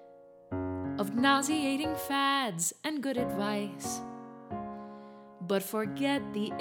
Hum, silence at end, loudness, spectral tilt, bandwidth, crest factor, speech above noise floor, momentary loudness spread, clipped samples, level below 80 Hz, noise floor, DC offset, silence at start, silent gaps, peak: none; 0 s; -31 LUFS; -3.5 dB/octave; 19 kHz; 22 dB; 24 dB; 17 LU; under 0.1%; -64 dBFS; -54 dBFS; under 0.1%; 0 s; none; -10 dBFS